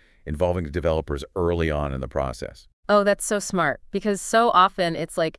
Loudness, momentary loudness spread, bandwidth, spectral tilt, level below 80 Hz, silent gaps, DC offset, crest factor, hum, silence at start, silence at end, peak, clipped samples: -23 LUFS; 12 LU; 12 kHz; -4.5 dB/octave; -40 dBFS; 2.73-2.83 s; under 0.1%; 18 dB; none; 0.25 s; 0.05 s; -4 dBFS; under 0.1%